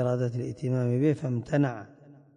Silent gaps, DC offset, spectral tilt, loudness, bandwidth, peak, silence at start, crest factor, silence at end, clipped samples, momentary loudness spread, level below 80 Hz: none; under 0.1%; -9 dB/octave; -28 LUFS; 9.8 kHz; -14 dBFS; 0 s; 14 dB; 0.25 s; under 0.1%; 6 LU; -62 dBFS